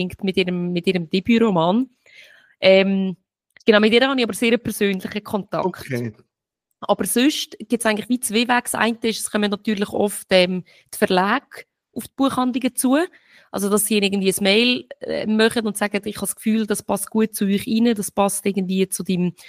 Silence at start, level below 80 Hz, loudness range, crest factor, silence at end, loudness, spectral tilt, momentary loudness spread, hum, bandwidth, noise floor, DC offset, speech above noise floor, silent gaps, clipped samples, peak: 0 s; -58 dBFS; 4 LU; 18 dB; 0 s; -20 LUFS; -4 dB/octave; 10 LU; none; 15.5 kHz; -78 dBFS; under 0.1%; 59 dB; none; under 0.1%; -2 dBFS